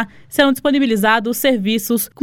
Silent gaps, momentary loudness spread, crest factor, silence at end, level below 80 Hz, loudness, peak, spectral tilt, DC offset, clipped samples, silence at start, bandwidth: none; 4 LU; 16 dB; 0.15 s; -50 dBFS; -16 LUFS; 0 dBFS; -4 dB/octave; under 0.1%; under 0.1%; 0 s; 18.5 kHz